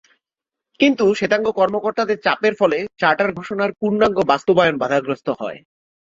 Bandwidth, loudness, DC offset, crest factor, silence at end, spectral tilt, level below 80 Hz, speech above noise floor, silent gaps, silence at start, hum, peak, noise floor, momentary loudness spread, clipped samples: 7.8 kHz; -18 LUFS; under 0.1%; 18 dB; 0.45 s; -5.5 dB/octave; -58 dBFS; 68 dB; none; 0.8 s; none; -2 dBFS; -86 dBFS; 7 LU; under 0.1%